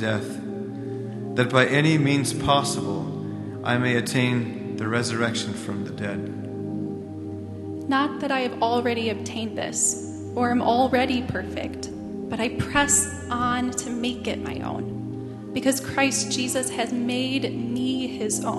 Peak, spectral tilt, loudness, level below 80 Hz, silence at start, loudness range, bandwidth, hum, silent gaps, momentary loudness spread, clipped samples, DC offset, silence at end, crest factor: -2 dBFS; -4 dB/octave; -25 LUFS; -52 dBFS; 0 s; 4 LU; 12.5 kHz; none; none; 12 LU; under 0.1%; under 0.1%; 0 s; 24 dB